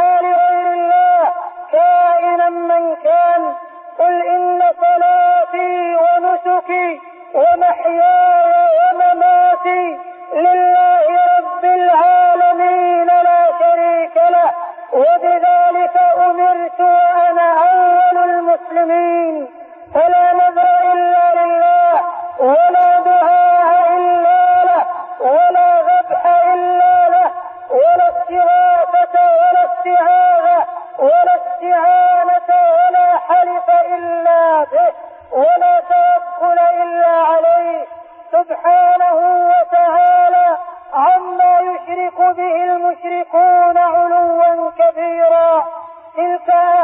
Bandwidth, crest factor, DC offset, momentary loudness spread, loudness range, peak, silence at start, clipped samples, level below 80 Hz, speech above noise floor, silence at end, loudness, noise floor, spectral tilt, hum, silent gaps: 3.8 kHz; 8 dB; under 0.1%; 7 LU; 2 LU; -4 dBFS; 0 s; under 0.1%; -64 dBFS; 22 dB; 0 s; -12 LUFS; -34 dBFS; -7.5 dB/octave; none; none